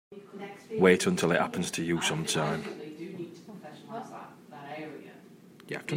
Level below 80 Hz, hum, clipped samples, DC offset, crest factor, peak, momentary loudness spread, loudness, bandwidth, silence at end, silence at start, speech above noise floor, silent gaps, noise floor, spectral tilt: -70 dBFS; none; under 0.1%; under 0.1%; 24 dB; -8 dBFS; 22 LU; -28 LUFS; 16 kHz; 0 s; 0.1 s; 25 dB; none; -53 dBFS; -4.5 dB/octave